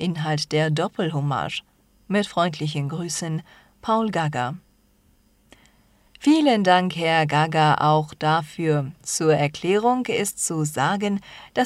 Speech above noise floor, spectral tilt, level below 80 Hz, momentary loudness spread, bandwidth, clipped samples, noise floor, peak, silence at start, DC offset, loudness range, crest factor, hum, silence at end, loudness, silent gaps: 38 dB; -5 dB/octave; -60 dBFS; 10 LU; 15.5 kHz; under 0.1%; -60 dBFS; -4 dBFS; 0 s; under 0.1%; 7 LU; 20 dB; none; 0 s; -22 LUFS; none